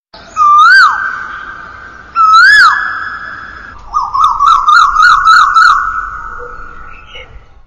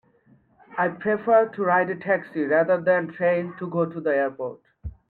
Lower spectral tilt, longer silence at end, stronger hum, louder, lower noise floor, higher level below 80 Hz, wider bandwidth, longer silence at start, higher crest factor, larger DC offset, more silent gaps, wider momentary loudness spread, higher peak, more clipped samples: second, 0 dB/octave vs -10 dB/octave; first, 0.4 s vs 0.2 s; neither; first, -6 LUFS vs -23 LUFS; second, -32 dBFS vs -59 dBFS; first, -36 dBFS vs -52 dBFS; first, 12 kHz vs 4.4 kHz; second, 0.15 s vs 0.7 s; second, 10 dB vs 16 dB; first, 0.2% vs under 0.1%; neither; first, 22 LU vs 15 LU; first, 0 dBFS vs -8 dBFS; neither